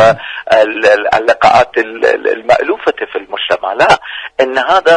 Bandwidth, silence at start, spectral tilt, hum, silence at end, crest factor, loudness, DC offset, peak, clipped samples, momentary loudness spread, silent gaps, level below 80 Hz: 10.5 kHz; 0 s; -4 dB/octave; none; 0 s; 10 dB; -11 LUFS; under 0.1%; 0 dBFS; 0.1%; 9 LU; none; -46 dBFS